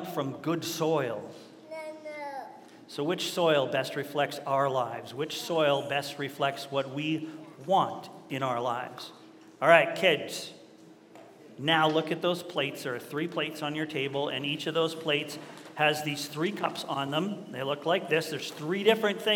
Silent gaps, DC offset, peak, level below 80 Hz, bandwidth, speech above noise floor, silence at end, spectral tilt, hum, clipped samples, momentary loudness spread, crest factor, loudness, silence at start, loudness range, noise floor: none; under 0.1%; -4 dBFS; -84 dBFS; 17.5 kHz; 24 dB; 0 s; -4.5 dB/octave; none; under 0.1%; 15 LU; 26 dB; -29 LUFS; 0 s; 4 LU; -53 dBFS